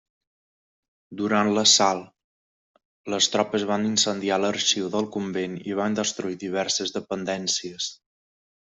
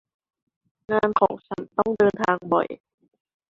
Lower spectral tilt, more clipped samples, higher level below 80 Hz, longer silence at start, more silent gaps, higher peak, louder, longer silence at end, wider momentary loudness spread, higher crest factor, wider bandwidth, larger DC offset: second, -2.5 dB/octave vs -7 dB/octave; neither; second, -68 dBFS vs -60 dBFS; first, 1.1 s vs 0.9 s; first, 2.24-2.74 s, 2.85-3.04 s vs none; about the same, -4 dBFS vs -4 dBFS; about the same, -23 LUFS vs -23 LUFS; about the same, 0.7 s vs 0.75 s; about the same, 12 LU vs 11 LU; about the same, 22 dB vs 20 dB; about the same, 8.2 kHz vs 7.6 kHz; neither